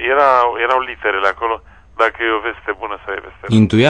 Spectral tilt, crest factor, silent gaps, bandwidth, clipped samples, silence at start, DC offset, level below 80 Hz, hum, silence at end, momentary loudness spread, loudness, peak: -6.5 dB/octave; 14 dB; none; 9.8 kHz; under 0.1%; 0 s; 0.2%; -46 dBFS; none; 0 s; 13 LU; -17 LUFS; -2 dBFS